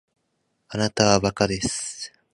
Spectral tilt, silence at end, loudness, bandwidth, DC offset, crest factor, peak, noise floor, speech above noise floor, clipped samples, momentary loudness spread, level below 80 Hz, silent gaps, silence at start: -4 dB/octave; 0.25 s; -22 LUFS; 11.5 kHz; under 0.1%; 24 dB; -2 dBFS; -73 dBFS; 51 dB; under 0.1%; 14 LU; -48 dBFS; none; 0.7 s